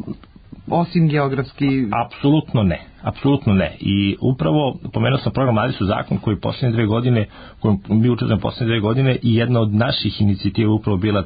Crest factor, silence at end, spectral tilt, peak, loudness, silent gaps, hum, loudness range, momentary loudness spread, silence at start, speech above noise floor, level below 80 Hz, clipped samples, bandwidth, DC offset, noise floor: 12 dB; 0 s; -12.5 dB/octave; -6 dBFS; -19 LUFS; none; none; 1 LU; 5 LU; 0 s; 23 dB; -38 dBFS; under 0.1%; 5 kHz; under 0.1%; -41 dBFS